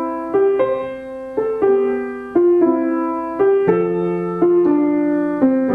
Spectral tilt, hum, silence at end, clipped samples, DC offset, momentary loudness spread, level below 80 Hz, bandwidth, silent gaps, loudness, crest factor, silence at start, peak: -10 dB/octave; none; 0 s; under 0.1%; under 0.1%; 8 LU; -54 dBFS; 4 kHz; none; -17 LUFS; 16 dB; 0 s; -2 dBFS